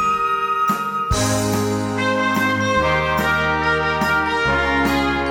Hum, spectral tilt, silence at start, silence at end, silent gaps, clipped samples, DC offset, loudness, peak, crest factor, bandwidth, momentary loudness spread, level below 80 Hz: none; -4.5 dB/octave; 0 s; 0 s; none; under 0.1%; under 0.1%; -18 LUFS; -4 dBFS; 14 dB; over 20 kHz; 3 LU; -34 dBFS